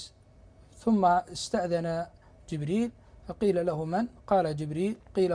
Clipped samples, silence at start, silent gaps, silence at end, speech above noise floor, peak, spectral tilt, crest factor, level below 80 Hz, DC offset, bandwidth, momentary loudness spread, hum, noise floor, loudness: under 0.1%; 0 s; none; 0 s; 28 dB; -12 dBFS; -6.5 dB/octave; 18 dB; -56 dBFS; under 0.1%; 10.5 kHz; 13 LU; none; -56 dBFS; -29 LUFS